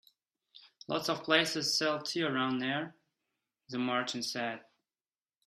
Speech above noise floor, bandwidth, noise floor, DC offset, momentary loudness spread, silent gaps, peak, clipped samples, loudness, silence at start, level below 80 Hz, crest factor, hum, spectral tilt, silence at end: over 57 dB; 14 kHz; under -90 dBFS; under 0.1%; 13 LU; none; -10 dBFS; under 0.1%; -32 LUFS; 0.55 s; -80 dBFS; 26 dB; none; -3 dB/octave; 0.85 s